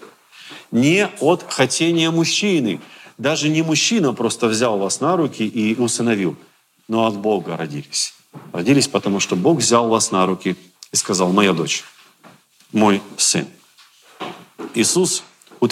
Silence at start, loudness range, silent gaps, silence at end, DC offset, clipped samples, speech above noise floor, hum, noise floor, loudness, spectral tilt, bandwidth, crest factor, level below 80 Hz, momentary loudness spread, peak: 0.4 s; 3 LU; none; 0 s; under 0.1%; under 0.1%; 33 dB; none; -51 dBFS; -18 LUFS; -3.5 dB/octave; 16 kHz; 18 dB; -72 dBFS; 11 LU; 0 dBFS